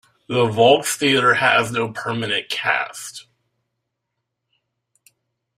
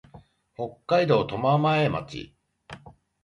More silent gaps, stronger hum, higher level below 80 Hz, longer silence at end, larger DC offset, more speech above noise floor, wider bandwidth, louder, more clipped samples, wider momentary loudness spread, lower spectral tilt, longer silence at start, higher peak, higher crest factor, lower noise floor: neither; neither; about the same, -62 dBFS vs -58 dBFS; first, 2.4 s vs 0.3 s; neither; first, 60 dB vs 29 dB; first, 16 kHz vs 10 kHz; first, -18 LUFS vs -24 LUFS; neither; second, 14 LU vs 24 LU; second, -3.5 dB/octave vs -7.5 dB/octave; first, 0.3 s vs 0.15 s; first, -2 dBFS vs -8 dBFS; about the same, 20 dB vs 18 dB; first, -78 dBFS vs -53 dBFS